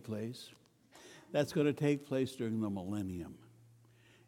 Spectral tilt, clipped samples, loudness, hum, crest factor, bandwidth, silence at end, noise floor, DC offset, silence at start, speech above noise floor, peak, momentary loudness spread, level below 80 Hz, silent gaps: -6.5 dB/octave; under 0.1%; -36 LUFS; none; 20 dB; 17 kHz; 0.85 s; -64 dBFS; under 0.1%; 0 s; 28 dB; -18 dBFS; 22 LU; -72 dBFS; none